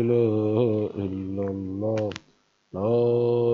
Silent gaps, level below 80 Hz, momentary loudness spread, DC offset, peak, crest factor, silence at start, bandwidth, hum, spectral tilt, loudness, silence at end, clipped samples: none; -66 dBFS; 9 LU; under 0.1%; -10 dBFS; 14 dB; 0 s; 7 kHz; none; -9 dB/octave; -25 LUFS; 0 s; under 0.1%